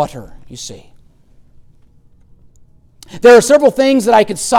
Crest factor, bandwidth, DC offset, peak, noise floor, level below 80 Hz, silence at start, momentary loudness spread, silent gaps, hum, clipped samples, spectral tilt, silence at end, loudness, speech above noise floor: 14 dB; 16 kHz; under 0.1%; 0 dBFS; -46 dBFS; -46 dBFS; 0 s; 23 LU; none; none; under 0.1%; -3.5 dB/octave; 0 s; -10 LUFS; 35 dB